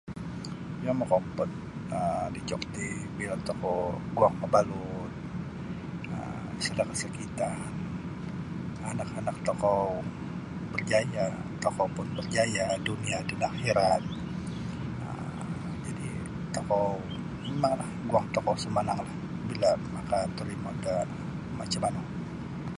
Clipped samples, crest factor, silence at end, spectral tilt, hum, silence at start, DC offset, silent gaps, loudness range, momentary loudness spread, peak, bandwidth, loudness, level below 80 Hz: under 0.1%; 22 dB; 0 s; -5.5 dB/octave; none; 0.05 s; under 0.1%; none; 4 LU; 10 LU; -10 dBFS; 11.5 kHz; -31 LUFS; -52 dBFS